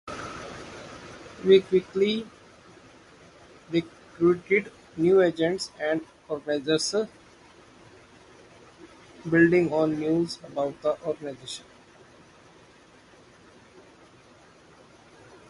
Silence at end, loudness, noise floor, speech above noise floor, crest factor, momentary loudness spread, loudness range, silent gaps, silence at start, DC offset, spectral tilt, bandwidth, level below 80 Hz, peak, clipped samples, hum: 3.9 s; -25 LUFS; -54 dBFS; 30 dB; 22 dB; 21 LU; 9 LU; none; 0.05 s; under 0.1%; -5.5 dB/octave; 11.5 kHz; -62 dBFS; -6 dBFS; under 0.1%; none